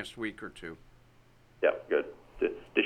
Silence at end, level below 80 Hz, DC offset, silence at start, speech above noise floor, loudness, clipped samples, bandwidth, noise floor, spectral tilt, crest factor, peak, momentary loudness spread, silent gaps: 0 s; -60 dBFS; under 0.1%; 0 s; 27 dB; -33 LUFS; under 0.1%; 13 kHz; -60 dBFS; -5 dB/octave; 22 dB; -12 dBFS; 16 LU; none